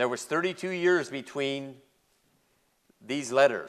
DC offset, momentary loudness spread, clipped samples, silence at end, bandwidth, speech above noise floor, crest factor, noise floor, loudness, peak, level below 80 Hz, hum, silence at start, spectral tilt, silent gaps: under 0.1%; 11 LU; under 0.1%; 0 s; 13.5 kHz; 42 dB; 22 dB; -70 dBFS; -28 LUFS; -8 dBFS; -78 dBFS; none; 0 s; -4 dB/octave; none